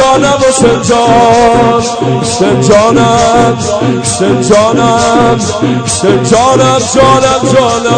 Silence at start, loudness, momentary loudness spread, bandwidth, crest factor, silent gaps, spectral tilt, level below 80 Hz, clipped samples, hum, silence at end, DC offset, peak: 0 s; -7 LUFS; 5 LU; 11 kHz; 6 dB; none; -4.5 dB/octave; -32 dBFS; 2%; none; 0 s; 0.3%; 0 dBFS